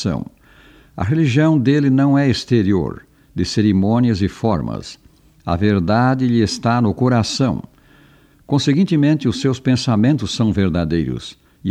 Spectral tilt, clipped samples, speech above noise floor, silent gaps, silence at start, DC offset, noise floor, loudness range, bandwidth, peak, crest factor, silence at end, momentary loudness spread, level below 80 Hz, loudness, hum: -6.5 dB/octave; under 0.1%; 34 dB; none; 0 s; under 0.1%; -50 dBFS; 2 LU; 10.5 kHz; -2 dBFS; 16 dB; 0 s; 13 LU; -42 dBFS; -17 LUFS; none